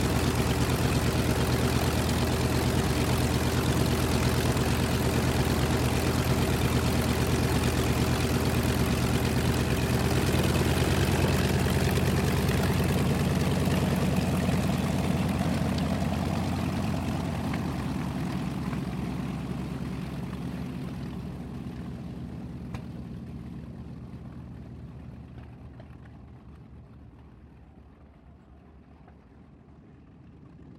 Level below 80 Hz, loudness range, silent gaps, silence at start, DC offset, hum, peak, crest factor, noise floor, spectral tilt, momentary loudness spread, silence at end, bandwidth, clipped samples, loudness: -38 dBFS; 16 LU; none; 0 s; under 0.1%; none; -12 dBFS; 16 dB; -52 dBFS; -5.5 dB/octave; 16 LU; 0 s; 16.5 kHz; under 0.1%; -27 LUFS